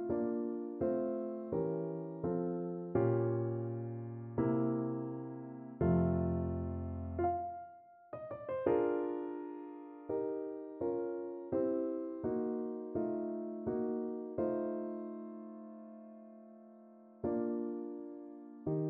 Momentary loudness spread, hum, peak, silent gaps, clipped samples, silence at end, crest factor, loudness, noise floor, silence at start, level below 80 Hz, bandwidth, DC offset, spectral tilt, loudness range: 16 LU; none; -18 dBFS; none; under 0.1%; 0 s; 20 dB; -38 LUFS; -58 dBFS; 0 s; -60 dBFS; 3.3 kHz; under 0.1%; -11 dB/octave; 6 LU